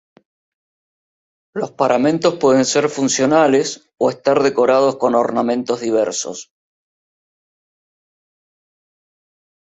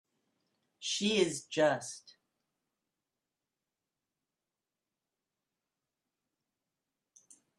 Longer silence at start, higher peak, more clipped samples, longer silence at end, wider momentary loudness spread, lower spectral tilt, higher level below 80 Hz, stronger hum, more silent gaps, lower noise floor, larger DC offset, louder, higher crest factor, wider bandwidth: first, 1.55 s vs 0.8 s; first, -2 dBFS vs -16 dBFS; neither; second, 3.3 s vs 5.6 s; second, 11 LU vs 14 LU; about the same, -4 dB/octave vs -3 dB/octave; first, -62 dBFS vs -82 dBFS; neither; neither; about the same, under -90 dBFS vs under -90 dBFS; neither; first, -16 LUFS vs -32 LUFS; second, 18 dB vs 24 dB; second, 8.4 kHz vs 12.5 kHz